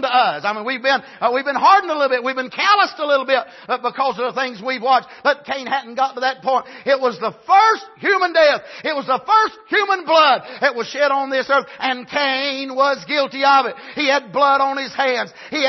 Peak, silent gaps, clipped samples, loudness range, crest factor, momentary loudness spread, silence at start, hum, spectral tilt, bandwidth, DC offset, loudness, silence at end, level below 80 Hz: -2 dBFS; none; under 0.1%; 3 LU; 16 dB; 9 LU; 0 s; none; -3 dB/octave; 6.2 kHz; under 0.1%; -17 LUFS; 0 s; -70 dBFS